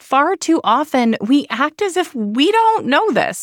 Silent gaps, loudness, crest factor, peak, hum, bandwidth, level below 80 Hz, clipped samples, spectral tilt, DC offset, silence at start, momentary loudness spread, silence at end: none; -16 LUFS; 12 dB; -2 dBFS; none; 17 kHz; -66 dBFS; under 0.1%; -4 dB/octave; under 0.1%; 0.1 s; 6 LU; 0 s